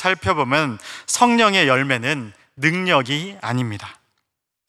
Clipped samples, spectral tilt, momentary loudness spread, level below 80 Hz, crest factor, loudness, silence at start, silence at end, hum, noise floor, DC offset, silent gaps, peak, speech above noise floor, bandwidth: under 0.1%; -4 dB/octave; 14 LU; -58 dBFS; 18 dB; -18 LUFS; 0 s; 0.75 s; none; -77 dBFS; under 0.1%; none; -2 dBFS; 58 dB; 14.5 kHz